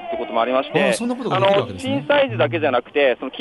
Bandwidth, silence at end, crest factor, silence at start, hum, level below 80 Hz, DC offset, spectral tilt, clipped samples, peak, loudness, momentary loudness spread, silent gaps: 11.5 kHz; 0 s; 14 dB; 0 s; none; -60 dBFS; under 0.1%; -5 dB/octave; under 0.1%; -4 dBFS; -19 LUFS; 5 LU; none